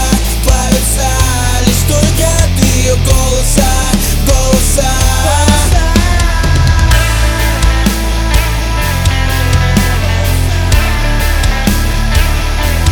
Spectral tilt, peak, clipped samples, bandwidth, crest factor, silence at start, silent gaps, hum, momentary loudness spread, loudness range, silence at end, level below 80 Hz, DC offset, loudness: -4 dB/octave; 0 dBFS; 0.3%; over 20 kHz; 10 dB; 0 s; none; none; 3 LU; 2 LU; 0 s; -12 dBFS; under 0.1%; -11 LUFS